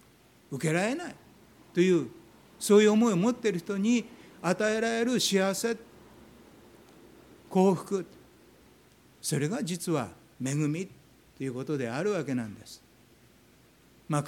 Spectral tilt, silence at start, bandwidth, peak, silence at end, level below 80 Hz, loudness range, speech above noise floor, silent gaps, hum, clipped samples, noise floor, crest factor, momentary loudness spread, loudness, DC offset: -5 dB/octave; 0.5 s; 17.5 kHz; -10 dBFS; 0 s; -70 dBFS; 8 LU; 32 dB; none; none; under 0.1%; -60 dBFS; 20 dB; 16 LU; -28 LUFS; under 0.1%